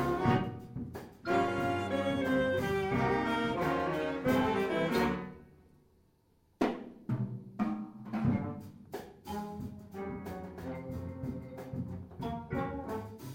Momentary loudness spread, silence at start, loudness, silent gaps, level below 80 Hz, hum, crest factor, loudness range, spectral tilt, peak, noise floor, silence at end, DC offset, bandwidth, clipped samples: 13 LU; 0 s; -34 LUFS; none; -56 dBFS; none; 18 dB; 10 LU; -7 dB/octave; -16 dBFS; -69 dBFS; 0 s; under 0.1%; 16.5 kHz; under 0.1%